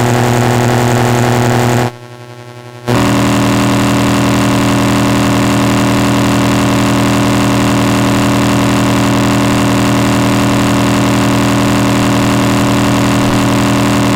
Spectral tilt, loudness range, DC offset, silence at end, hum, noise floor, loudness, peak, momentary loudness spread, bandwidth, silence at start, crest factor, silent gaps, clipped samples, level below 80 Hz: -5.5 dB/octave; 2 LU; under 0.1%; 0 s; none; -30 dBFS; -11 LUFS; 0 dBFS; 0 LU; 16.5 kHz; 0 s; 10 dB; none; under 0.1%; -30 dBFS